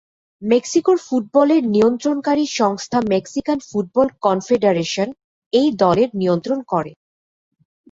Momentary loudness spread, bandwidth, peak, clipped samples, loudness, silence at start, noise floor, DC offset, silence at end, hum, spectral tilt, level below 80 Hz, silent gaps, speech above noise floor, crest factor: 7 LU; 8 kHz; -2 dBFS; under 0.1%; -18 LUFS; 0.4 s; under -90 dBFS; under 0.1%; 1 s; none; -5.5 dB/octave; -58 dBFS; 5.24-5.51 s; over 73 dB; 16 dB